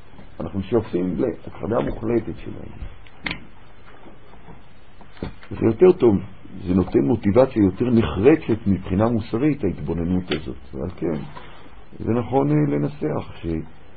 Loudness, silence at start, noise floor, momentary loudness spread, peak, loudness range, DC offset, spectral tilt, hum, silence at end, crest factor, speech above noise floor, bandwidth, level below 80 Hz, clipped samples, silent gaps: -21 LUFS; 0.2 s; -47 dBFS; 18 LU; -2 dBFS; 10 LU; 2%; -12.5 dB/octave; none; 0.3 s; 20 dB; 26 dB; 4.8 kHz; -42 dBFS; under 0.1%; none